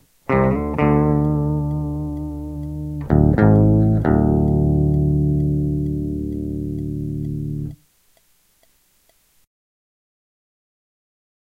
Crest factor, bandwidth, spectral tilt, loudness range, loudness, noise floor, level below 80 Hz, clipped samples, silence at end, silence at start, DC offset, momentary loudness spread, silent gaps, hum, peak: 20 dB; 3.1 kHz; -11 dB/octave; 14 LU; -19 LUFS; -60 dBFS; -30 dBFS; under 0.1%; 3.7 s; 0.3 s; under 0.1%; 14 LU; none; none; 0 dBFS